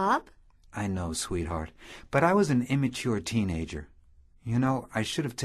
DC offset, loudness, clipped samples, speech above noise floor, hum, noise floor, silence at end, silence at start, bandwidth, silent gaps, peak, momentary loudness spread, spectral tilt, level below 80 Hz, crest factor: under 0.1%; -29 LUFS; under 0.1%; 29 dB; none; -58 dBFS; 0 s; 0 s; 13.5 kHz; none; -10 dBFS; 16 LU; -5.5 dB/octave; -46 dBFS; 20 dB